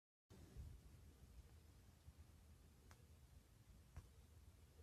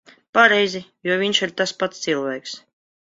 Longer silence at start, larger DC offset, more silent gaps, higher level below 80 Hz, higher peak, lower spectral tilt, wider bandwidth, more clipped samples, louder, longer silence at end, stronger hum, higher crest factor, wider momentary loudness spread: about the same, 0.3 s vs 0.35 s; neither; neither; about the same, -68 dBFS vs -68 dBFS; second, -44 dBFS vs 0 dBFS; first, -5.5 dB/octave vs -3 dB/octave; first, 14 kHz vs 7.8 kHz; neither; second, -67 LUFS vs -20 LUFS; second, 0 s vs 0.6 s; neither; about the same, 20 dB vs 22 dB; second, 8 LU vs 15 LU